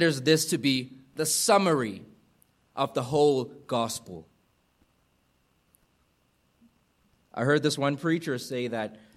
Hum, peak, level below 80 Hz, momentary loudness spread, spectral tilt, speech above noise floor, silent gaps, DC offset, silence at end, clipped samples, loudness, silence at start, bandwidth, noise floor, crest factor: none; -6 dBFS; -70 dBFS; 17 LU; -4 dB/octave; 43 dB; none; under 0.1%; 0.2 s; under 0.1%; -26 LUFS; 0 s; 15.5 kHz; -69 dBFS; 22 dB